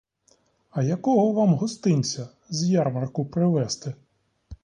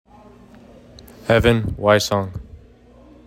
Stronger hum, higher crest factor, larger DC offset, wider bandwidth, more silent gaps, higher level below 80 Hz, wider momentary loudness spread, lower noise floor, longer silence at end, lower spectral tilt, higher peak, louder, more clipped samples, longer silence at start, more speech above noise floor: neither; about the same, 16 dB vs 20 dB; neither; second, 10.5 kHz vs 16 kHz; neither; second, -58 dBFS vs -38 dBFS; second, 12 LU vs 16 LU; first, -64 dBFS vs -47 dBFS; second, 0.1 s vs 0.7 s; about the same, -6.5 dB/octave vs -5.5 dB/octave; second, -10 dBFS vs -2 dBFS; second, -24 LUFS vs -18 LUFS; neither; second, 0.75 s vs 1.25 s; first, 41 dB vs 30 dB